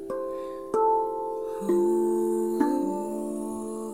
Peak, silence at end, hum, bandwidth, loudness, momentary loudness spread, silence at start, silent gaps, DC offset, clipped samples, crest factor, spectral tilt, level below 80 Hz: -10 dBFS; 0 s; none; 16 kHz; -27 LUFS; 9 LU; 0 s; none; 0.2%; under 0.1%; 18 dB; -7 dB/octave; -62 dBFS